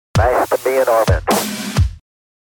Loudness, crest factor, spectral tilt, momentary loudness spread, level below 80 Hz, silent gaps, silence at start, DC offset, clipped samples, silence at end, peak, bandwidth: -16 LUFS; 14 dB; -5 dB/octave; 5 LU; -26 dBFS; none; 0.15 s; under 0.1%; under 0.1%; 0.55 s; -2 dBFS; 19.5 kHz